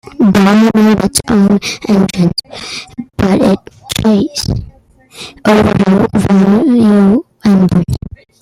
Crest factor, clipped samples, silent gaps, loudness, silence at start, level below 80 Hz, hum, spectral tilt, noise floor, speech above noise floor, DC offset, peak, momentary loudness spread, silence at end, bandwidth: 10 dB; under 0.1%; none; -10 LUFS; 0.2 s; -34 dBFS; none; -6 dB/octave; -41 dBFS; 31 dB; under 0.1%; 0 dBFS; 15 LU; 0.35 s; 15.5 kHz